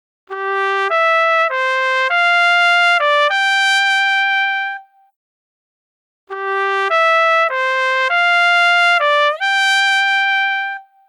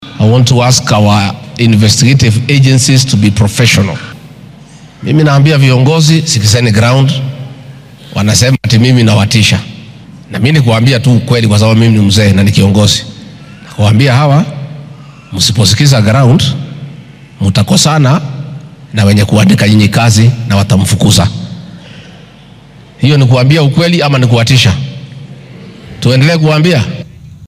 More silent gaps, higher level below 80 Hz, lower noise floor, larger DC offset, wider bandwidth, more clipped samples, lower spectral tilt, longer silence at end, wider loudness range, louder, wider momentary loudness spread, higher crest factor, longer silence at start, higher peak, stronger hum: first, 5.16-6.27 s vs none; second, -88 dBFS vs -38 dBFS; first, under -90 dBFS vs -35 dBFS; neither; second, 14 kHz vs 16 kHz; second, under 0.1% vs 0.3%; second, 3 dB/octave vs -5 dB/octave; first, 0.25 s vs 0 s; about the same, 5 LU vs 3 LU; second, -13 LUFS vs -8 LUFS; second, 10 LU vs 16 LU; about the same, 12 dB vs 8 dB; first, 0.3 s vs 0 s; about the same, -2 dBFS vs 0 dBFS; neither